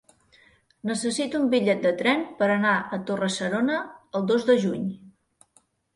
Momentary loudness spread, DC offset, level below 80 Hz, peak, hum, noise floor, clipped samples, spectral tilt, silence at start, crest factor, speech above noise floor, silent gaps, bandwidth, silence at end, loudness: 10 LU; under 0.1%; -66 dBFS; -8 dBFS; none; -64 dBFS; under 0.1%; -5 dB/octave; 0.85 s; 18 dB; 40 dB; none; 11.5 kHz; 0.85 s; -24 LUFS